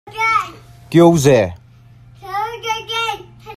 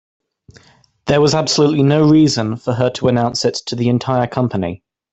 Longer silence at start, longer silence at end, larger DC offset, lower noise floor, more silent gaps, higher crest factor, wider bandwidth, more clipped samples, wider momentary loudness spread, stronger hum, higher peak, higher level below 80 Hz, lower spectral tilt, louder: second, 0.05 s vs 1.05 s; second, 0 s vs 0.35 s; neither; second, -44 dBFS vs -51 dBFS; neither; about the same, 16 dB vs 16 dB; first, 15 kHz vs 8.2 kHz; neither; first, 14 LU vs 9 LU; neither; about the same, 0 dBFS vs 0 dBFS; about the same, -48 dBFS vs -48 dBFS; about the same, -5.5 dB/octave vs -5.5 dB/octave; about the same, -16 LUFS vs -15 LUFS